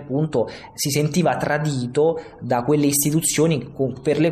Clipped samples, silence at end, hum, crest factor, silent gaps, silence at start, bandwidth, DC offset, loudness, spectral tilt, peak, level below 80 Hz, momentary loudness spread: under 0.1%; 0 s; none; 14 dB; none; 0 s; 14.5 kHz; under 0.1%; -21 LUFS; -5 dB/octave; -6 dBFS; -54 dBFS; 7 LU